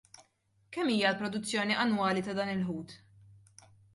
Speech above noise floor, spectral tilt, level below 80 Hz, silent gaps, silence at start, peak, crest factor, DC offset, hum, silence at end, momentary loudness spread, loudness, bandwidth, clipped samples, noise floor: 40 dB; -4.5 dB/octave; -72 dBFS; none; 0.2 s; -14 dBFS; 20 dB; under 0.1%; none; 1 s; 12 LU; -31 LUFS; 11.5 kHz; under 0.1%; -71 dBFS